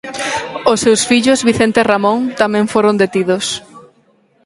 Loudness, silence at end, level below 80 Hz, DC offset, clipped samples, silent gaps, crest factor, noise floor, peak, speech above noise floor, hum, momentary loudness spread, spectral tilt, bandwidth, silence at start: -13 LUFS; 0.65 s; -50 dBFS; under 0.1%; under 0.1%; none; 14 dB; -54 dBFS; 0 dBFS; 41 dB; none; 8 LU; -4 dB/octave; 11.5 kHz; 0.05 s